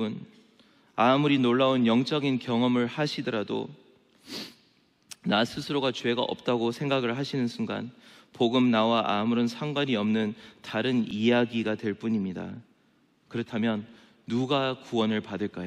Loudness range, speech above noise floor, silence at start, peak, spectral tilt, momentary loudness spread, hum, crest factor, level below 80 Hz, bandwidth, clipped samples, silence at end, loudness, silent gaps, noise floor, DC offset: 6 LU; 39 dB; 0 s; -10 dBFS; -6 dB/octave; 15 LU; none; 18 dB; -72 dBFS; 12 kHz; under 0.1%; 0 s; -27 LUFS; none; -65 dBFS; under 0.1%